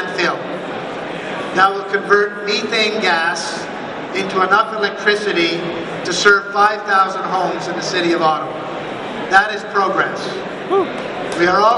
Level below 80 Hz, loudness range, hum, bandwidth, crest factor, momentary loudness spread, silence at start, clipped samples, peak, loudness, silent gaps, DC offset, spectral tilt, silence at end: -56 dBFS; 2 LU; none; 11.5 kHz; 18 dB; 11 LU; 0 s; under 0.1%; 0 dBFS; -17 LUFS; none; under 0.1%; -3.5 dB/octave; 0 s